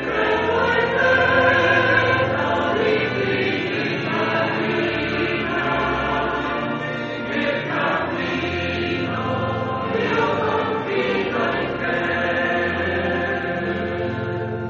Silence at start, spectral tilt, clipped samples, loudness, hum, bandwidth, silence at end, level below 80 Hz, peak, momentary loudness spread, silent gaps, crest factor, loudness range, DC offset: 0 s; -3.5 dB/octave; under 0.1%; -21 LUFS; none; 7.4 kHz; 0 s; -46 dBFS; -2 dBFS; 8 LU; none; 18 dB; 5 LU; under 0.1%